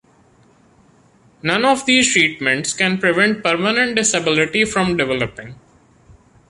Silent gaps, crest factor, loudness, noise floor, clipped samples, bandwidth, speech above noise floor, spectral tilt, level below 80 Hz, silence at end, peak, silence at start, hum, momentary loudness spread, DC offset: none; 16 dB; -16 LUFS; -53 dBFS; under 0.1%; 11.5 kHz; 35 dB; -3 dB/octave; -52 dBFS; 0.95 s; -2 dBFS; 1.45 s; none; 7 LU; under 0.1%